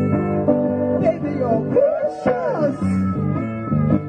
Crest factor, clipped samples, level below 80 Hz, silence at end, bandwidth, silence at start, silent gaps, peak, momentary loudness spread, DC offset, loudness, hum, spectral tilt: 14 dB; under 0.1%; -46 dBFS; 0 s; 9.4 kHz; 0 s; none; -4 dBFS; 4 LU; under 0.1%; -20 LUFS; none; -10 dB/octave